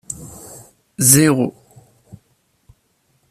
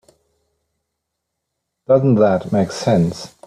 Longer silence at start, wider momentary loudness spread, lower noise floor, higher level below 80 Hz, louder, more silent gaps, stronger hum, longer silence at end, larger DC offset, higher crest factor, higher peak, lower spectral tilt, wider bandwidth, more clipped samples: second, 0.1 s vs 1.9 s; first, 27 LU vs 6 LU; second, -63 dBFS vs -78 dBFS; about the same, -54 dBFS vs -54 dBFS; first, -13 LUFS vs -16 LUFS; neither; neither; first, 1.8 s vs 0.2 s; neither; about the same, 20 dB vs 16 dB; about the same, 0 dBFS vs -2 dBFS; second, -4 dB/octave vs -7.5 dB/octave; first, 15 kHz vs 13 kHz; neither